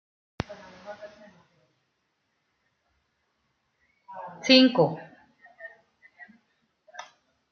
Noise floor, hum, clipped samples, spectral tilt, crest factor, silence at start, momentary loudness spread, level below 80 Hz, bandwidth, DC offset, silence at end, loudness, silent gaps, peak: -76 dBFS; none; under 0.1%; -2.5 dB/octave; 26 dB; 0.5 s; 28 LU; -66 dBFS; 6.8 kHz; under 0.1%; 0.5 s; -22 LUFS; none; -4 dBFS